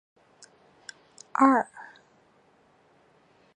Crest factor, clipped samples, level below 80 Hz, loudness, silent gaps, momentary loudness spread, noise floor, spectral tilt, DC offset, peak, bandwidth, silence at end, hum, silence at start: 26 dB; under 0.1%; -82 dBFS; -24 LUFS; none; 26 LU; -62 dBFS; -4.5 dB/octave; under 0.1%; -6 dBFS; 9.8 kHz; 1.75 s; none; 1.4 s